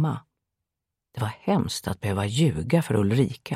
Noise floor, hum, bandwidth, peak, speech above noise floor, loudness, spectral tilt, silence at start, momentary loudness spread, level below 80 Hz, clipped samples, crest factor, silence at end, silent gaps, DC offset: -86 dBFS; none; 15 kHz; -8 dBFS; 62 dB; -25 LUFS; -6.5 dB/octave; 0 s; 10 LU; -52 dBFS; under 0.1%; 18 dB; 0 s; none; under 0.1%